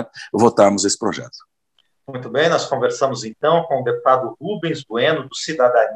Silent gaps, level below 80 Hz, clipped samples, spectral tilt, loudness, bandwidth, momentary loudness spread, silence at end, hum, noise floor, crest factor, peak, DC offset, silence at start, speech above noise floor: none; -66 dBFS; under 0.1%; -4 dB/octave; -18 LUFS; 11.5 kHz; 11 LU; 0 s; none; -66 dBFS; 18 dB; -2 dBFS; under 0.1%; 0 s; 48 dB